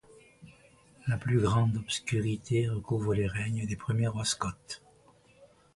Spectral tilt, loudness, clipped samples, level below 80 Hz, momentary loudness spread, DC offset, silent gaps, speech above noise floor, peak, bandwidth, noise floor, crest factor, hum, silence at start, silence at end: -5.5 dB/octave; -31 LUFS; under 0.1%; -54 dBFS; 9 LU; under 0.1%; none; 31 dB; -14 dBFS; 11.5 kHz; -61 dBFS; 16 dB; none; 0.4 s; 0.3 s